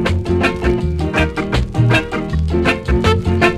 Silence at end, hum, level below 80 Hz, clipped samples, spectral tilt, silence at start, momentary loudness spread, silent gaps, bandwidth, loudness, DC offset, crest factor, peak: 0 s; none; -24 dBFS; under 0.1%; -6.5 dB/octave; 0 s; 4 LU; none; 12.5 kHz; -16 LUFS; under 0.1%; 14 dB; 0 dBFS